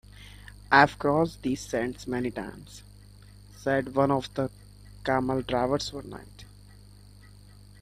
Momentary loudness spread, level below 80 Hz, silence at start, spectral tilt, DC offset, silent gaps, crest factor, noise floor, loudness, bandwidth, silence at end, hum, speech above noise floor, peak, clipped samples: 25 LU; -52 dBFS; 0.2 s; -5.5 dB/octave; under 0.1%; none; 26 dB; -51 dBFS; -27 LUFS; 15 kHz; 1.35 s; 50 Hz at -50 dBFS; 24 dB; -4 dBFS; under 0.1%